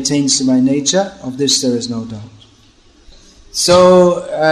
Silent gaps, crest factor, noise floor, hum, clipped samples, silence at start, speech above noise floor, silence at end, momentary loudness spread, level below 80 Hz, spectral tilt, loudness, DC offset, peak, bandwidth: none; 14 dB; -47 dBFS; none; under 0.1%; 0 s; 35 dB; 0 s; 16 LU; -48 dBFS; -4 dB/octave; -12 LUFS; under 0.1%; 0 dBFS; 13 kHz